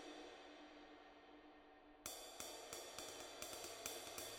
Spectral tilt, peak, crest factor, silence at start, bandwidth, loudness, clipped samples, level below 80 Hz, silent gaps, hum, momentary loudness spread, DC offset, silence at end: -1 dB/octave; -30 dBFS; 26 dB; 0 s; 19 kHz; -53 LUFS; under 0.1%; -78 dBFS; none; none; 14 LU; under 0.1%; 0 s